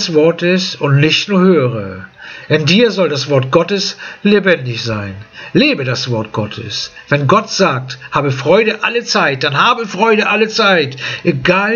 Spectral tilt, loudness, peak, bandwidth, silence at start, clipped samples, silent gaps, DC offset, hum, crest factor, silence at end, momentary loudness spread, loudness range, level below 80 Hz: -5 dB/octave; -13 LUFS; 0 dBFS; 7.2 kHz; 0 s; under 0.1%; none; under 0.1%; none; 14 dB; 0 s; 10 LU; 3 LU; -52 dBFS